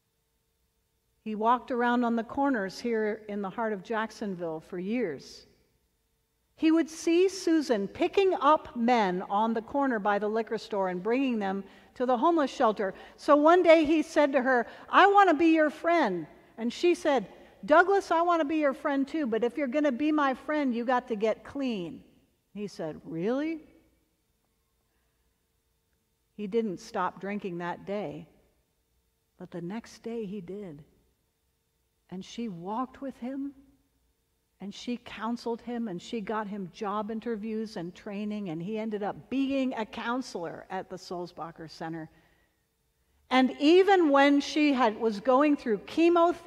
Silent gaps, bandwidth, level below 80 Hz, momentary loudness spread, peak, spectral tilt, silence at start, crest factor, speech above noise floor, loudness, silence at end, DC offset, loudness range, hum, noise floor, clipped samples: none; 12 kHz; -68 dBFS; 17 LU; -8 dBFS; -5.5 dB/octave; 1.25 s; 20 dB; 48 dB; -28 LUFS; 0.05 s; under 0.1%; 15 LU; none; -75 dBFS; under 0.1%